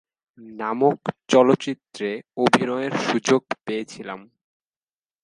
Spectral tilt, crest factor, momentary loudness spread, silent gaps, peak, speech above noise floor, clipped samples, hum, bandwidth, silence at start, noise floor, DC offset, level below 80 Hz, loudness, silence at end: -5 dB/octave; 22 dB; 16 LU; none; 0 dBFS; over 68 dB; under 0.1%; none; 11.5 kHz; 0.4 s; under -90 dBFS; under 0.1%; -70 dBFS; -22 LUFS; 1 s